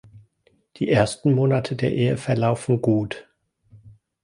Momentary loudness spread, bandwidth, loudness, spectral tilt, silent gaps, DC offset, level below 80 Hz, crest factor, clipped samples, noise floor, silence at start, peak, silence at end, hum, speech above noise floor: 7 LU; 11 kHz; -22 LUFS; -7 dB/octave; none; under 0.1%; -54 dBFS; 18 dB; under 0.1%; -64 dBFS; 0.15 s; -4 dBFS; 0.35 s; none; 43 dB